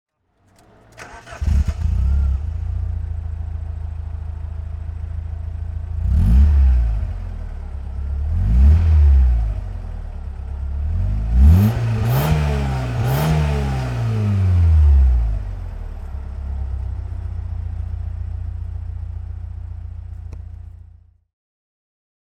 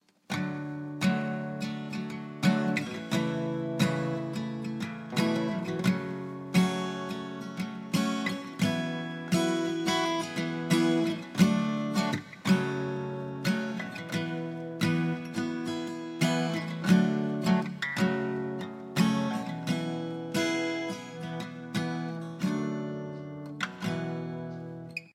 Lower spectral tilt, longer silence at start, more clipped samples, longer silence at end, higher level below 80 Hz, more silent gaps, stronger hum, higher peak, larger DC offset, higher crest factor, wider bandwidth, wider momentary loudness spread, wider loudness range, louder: first, -8 dB/octave vs -5.5 dB/octave; first, 1 s vs 0.3 s; neither; first, 1.6 s vs 0.05 s; first, -20 dBFS vs -70 dBFS; neither; neither; first, -2 dBFS vs -10 dBFS; neither; about the same, 16 dB vs 20 dB; about the same, 15.5 kHz vs 15.5 kHz; first, 18 LU vs 10 LU; first, 12 LU vs 5 LU; first, -20 LUFS vs -31 LUFS